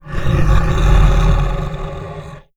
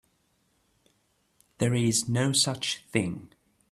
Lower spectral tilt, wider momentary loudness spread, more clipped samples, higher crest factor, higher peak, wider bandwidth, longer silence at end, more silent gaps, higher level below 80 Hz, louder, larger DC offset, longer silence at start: first, -7 dB/octave vs -4 dB/octave; first, 15 LU vs 8 LU; neither; second, 14 dB vs 22 dB; first, 0 dBFS vs -10 dBFS; second, 7.8 kHz vs 13 kHz; second, 0 s vs 0.45 s; neither; first, -16 dBFS vs -62 dBFS; first, -16 LUFS vs -26 LUFS; neither; second, 0.05 s vs 1.6 s